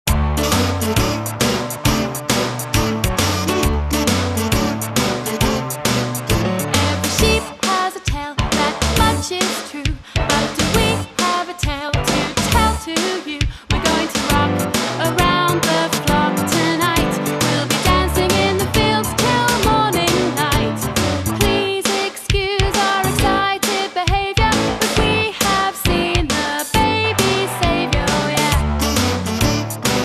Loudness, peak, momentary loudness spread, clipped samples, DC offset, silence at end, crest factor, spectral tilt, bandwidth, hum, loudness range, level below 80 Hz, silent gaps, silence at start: -17 LUFS; 0 dBFS; 4 LU; under 0.1%; under 0.1%; 0 s; 18 dB; -4 dB/octave; 14 kHz; none; 2 LU; -28 dBFS; none; 0.05 s